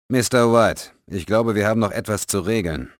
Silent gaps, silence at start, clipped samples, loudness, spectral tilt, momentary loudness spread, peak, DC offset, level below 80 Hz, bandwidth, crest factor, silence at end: none; 0.1 s; under 0.1%; -19 LUFS; -5 dB/octave; 12 LU; -4 dBFS; under 0.1%; -44 dBFS; over 20 kHz; 16 dB; 0.1 s